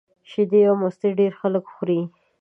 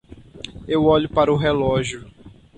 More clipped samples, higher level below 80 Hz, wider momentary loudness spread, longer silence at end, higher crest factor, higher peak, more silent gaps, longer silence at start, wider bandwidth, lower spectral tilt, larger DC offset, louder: neither; second, -76 dBFS vs -42 dBFS; second, 9 LU vs 19 LU; about the same, 0.35 s vs 0.3 s; about the same, 14 dB vs 16 dB; about the same, -6 dBFS vs -4 dBFS; neither; about the same, 0.3 s vs 0.35 s; second, 3.6 kHz vs 9.4 kHz; first, -9.5 dB/octave vs -6 dB/octave; neither; about the same, -21 LUFS vs -19 LUFS